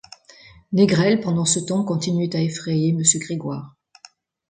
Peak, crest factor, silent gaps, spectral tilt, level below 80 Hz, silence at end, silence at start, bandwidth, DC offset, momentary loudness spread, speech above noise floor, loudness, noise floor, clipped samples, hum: -2 dBFS; 20 dB; none; -4.5 dB/octave; -60 dBFS; 0.8 s; 0.7 s; 9.6 kHz; under 0.1%; 11 LU; 31 dB; -20 LUFS; -51 dBFS; under 0.1%; none